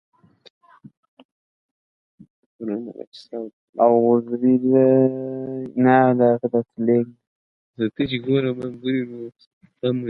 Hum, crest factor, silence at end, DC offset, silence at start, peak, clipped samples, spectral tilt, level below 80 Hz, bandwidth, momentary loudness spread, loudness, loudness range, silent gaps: none; 18 dB; 0 s; under 0.1%; 2.6 s; -2 dBFS; under 0.1%; -9.5 dB/octave; -64 dBFS; 5.6 kHz; 18 LU; -20 LUFS; 18 LU; 3.07-3.12 s, 3.53-3.73 s, 7.27-7.74 s, 9.47-9.61 s